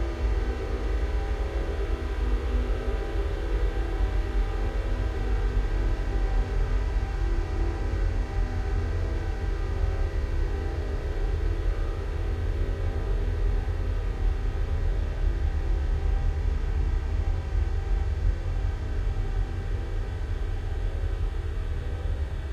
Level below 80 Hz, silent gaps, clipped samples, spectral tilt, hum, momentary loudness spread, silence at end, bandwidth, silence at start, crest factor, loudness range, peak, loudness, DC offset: -26 dBFS; none; under 0.1%; -7.5 dB/octave; none; 3 LU; 0 s; 7.4 kHz; 0 s; 12 dB; 1 LU; -14 dBFS; -30 LUFS; under 0.1%